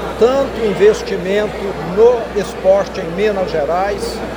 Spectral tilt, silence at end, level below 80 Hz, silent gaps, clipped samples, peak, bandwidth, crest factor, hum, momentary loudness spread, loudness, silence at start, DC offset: -5.5 dB/octave; 0 s; -36 dBFS; none; under 0.1%; 0 dBFS; over 20 kHz; 14 dB; none; 9 LU; -15 LUFS; 0 s; under 0.1%